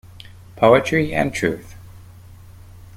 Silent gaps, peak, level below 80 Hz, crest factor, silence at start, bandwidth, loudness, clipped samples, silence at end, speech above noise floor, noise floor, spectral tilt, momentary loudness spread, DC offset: none; -2 dBFS; -46 dBFS; 20 dB; 0.55 s; 16.5 kHz; -18 LUFS; under 0.1%; 0.2 s; 25 dB; -42 dBFS; -6 dB/octave; 9 LU; under 0.1%